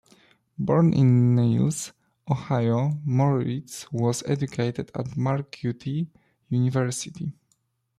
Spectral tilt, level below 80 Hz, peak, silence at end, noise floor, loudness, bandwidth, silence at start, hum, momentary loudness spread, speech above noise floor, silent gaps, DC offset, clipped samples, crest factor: -7 dB/octave; -60 dBFS; -10 dBFS; 0.65 s; -71 dBFS; -25 LUFS; 13 kHz; 0.6 s; none; 14 LU; 47 dB; none; under 0.1%; under 0.1%; 16 dB